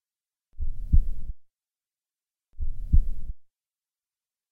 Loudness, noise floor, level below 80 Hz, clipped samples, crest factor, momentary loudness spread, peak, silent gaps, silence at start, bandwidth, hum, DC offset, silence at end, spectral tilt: -31 LUFS; under -90 dBFS; -28 dBFS; under 0.1%; 20 dB; 17 LU; -6 dBFS; none; 0.6 s; 0.6 kHz; none; under 0.1%; 1.1 s; -11 dB/octave